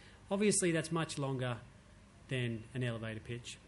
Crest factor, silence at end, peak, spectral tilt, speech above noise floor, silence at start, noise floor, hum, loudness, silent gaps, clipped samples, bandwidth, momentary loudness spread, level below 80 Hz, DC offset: 16 dB; 0 s; -20 dBFS; -4.5 dB/octave; 23 dB; 0 s; -59 dBFS; none; -37 LUFS; none; under 0.1%; 11.5 kHz; 12 LU; -64 dBFS; under 0.1%